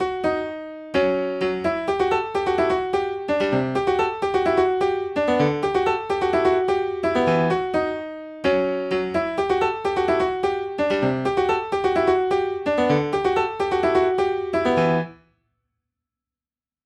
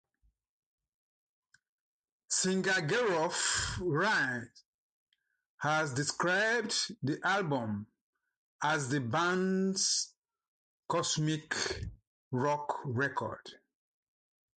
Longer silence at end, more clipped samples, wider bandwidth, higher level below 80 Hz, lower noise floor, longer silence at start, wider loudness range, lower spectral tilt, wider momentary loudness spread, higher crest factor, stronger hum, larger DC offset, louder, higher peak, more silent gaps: first, 1.7 s vs 1 s; neither; about the same, 9.8 kHz vs 9.4 kHz; first, -50 dBFS vs -60 dBFS; first, under -90 dBFS vs -76 dBFS; second, 0 s vs 2.3 s; about the same, 2 LU vs 3 LU; first, -6.5 dB/octave vs -3.5 dB/octave; second, 5 LU vs 10 LU; about the same, 14 dB vs 18 dB; neither; neither; first, -22 LUFS vs -32 LUFS; first, -8 dBFS vs -16 dBFS; second, none vs 4.65-5.07 s, 5.46-5.58 s, 8.01-8.13 s, 8.37-8.59 s, 10.17-10.22 s, 10.48-10.83 s, 12.07-12.31 s